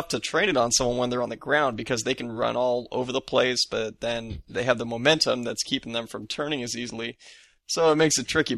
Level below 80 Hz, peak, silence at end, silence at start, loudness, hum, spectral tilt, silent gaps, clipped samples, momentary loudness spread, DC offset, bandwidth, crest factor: -52 dBFS; -6 dBFS; 0 s; 0 s; -25 LUFS; none; -3 dB/octave; none; under 0.1%; 10 LU; under 0.1%; 13.5 kHz; 20 dB